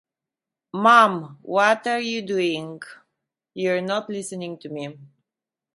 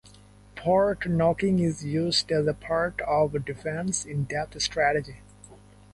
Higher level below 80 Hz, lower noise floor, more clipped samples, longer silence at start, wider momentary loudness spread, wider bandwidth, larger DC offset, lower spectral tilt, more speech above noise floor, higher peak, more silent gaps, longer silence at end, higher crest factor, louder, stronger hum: second, -76 dBFS vs -50 dBFS; first, -88 dBFS vs -52 dBFS; neither; first, 0.75 s vs 0.05 s; first, 21 LU vs 8 LU; about the same, 11.5 kHz vs 11.5 kHz; neither; about the same, -4.5 dB/octave vs -4.5 dB/octave; first, 66 dB vs 26 dB; first, 0 dBFS vs -10 dBFS; neither; first, 0.7 s vs 0.35 s; first, 22 dB vs 16 dB; first, -21 LUFS vs -26 LUFS; second, none vs 50 Hz at -45 dBFS